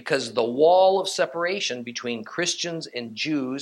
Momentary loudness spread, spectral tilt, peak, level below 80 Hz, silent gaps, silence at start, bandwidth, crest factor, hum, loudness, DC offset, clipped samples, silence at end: 13 LU; -3 dB/octave; -8 dBFS; -78 dBFS; none; 0.05 s; 12.5 kHz; 16 dB; none; -23 LUFS; under 0.1%; under 0.1%; 0 s